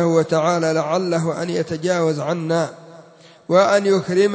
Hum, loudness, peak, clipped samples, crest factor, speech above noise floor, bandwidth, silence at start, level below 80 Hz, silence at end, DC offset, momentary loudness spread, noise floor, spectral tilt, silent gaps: none; -19 LUFS; -2 dBFS; under 0.1%; 16 dB; 28 dB; 8 kHz; 0 s; -64 dBFS; 0 s; under 0.1%; 7 LU; -46 dBFS; -6 dB/octave; none